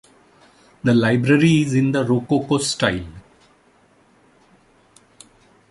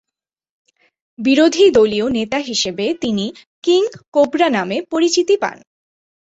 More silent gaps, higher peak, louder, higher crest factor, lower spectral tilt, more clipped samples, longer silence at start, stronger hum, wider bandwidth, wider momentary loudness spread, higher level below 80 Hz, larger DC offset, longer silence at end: second, none vs 3.47-3.62 s, 4.08-4.12 s; about the same, -2 dBFS vs -2 dBFS; about the same, -18 LUFS vs -16 LUFS; about the same, 18 dB vs 16 dB; first, -5.5 dB/octave vs -4 dB/octave; neither; second, 0.85 s vs 1.2 s; neither; first, 11.5 kHz vs 8.2 kHz; about the same, 8 LU vs 10 LU; about the same, -50 dBFS vs -54 dBFS; neither; first, 2.5 s vs 0.8 s